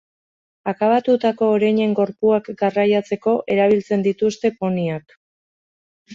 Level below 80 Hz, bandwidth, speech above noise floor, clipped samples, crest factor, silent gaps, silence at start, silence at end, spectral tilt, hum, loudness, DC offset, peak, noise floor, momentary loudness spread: -62 dBFS; 7.6 kHz; over 72 dB; under 0.1%; 14 dB; 5.17-6.06 s; 0.65 s; 0 s; -7 dB/octave; none; -19 LUFS; under 0.1%; -6 dBFS; under -90 dBFS; 6 LU